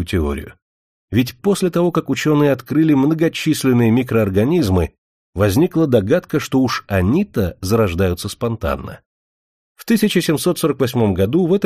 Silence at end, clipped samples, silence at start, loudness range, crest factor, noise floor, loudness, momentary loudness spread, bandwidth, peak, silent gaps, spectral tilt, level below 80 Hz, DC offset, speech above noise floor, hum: 0 s; under 0.1%; 0 s; 4 LU; 16 dB; under -90 dBFS; -17 LUFS; 8 LU; 15.5 kHz; -2 dBFS; 0.62-1.08 s, 4.98-5.33 s, 9.06-9.75 s; -6.5 dB/octave; -38 dBFS; under 0.1%; over 74 dB; none